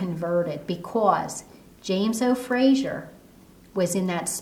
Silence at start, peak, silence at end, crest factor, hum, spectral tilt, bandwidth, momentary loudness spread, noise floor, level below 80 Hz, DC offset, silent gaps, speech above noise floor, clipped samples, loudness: 0 s; -6 dBFS; 0 s; 18 dB; none; -5 dB/octave; 17.5 kHz; 14 LU; -51 dBFS; -60 dBFS; under 0.1%; none; 27 dB; under 0.1%; -24 LUFS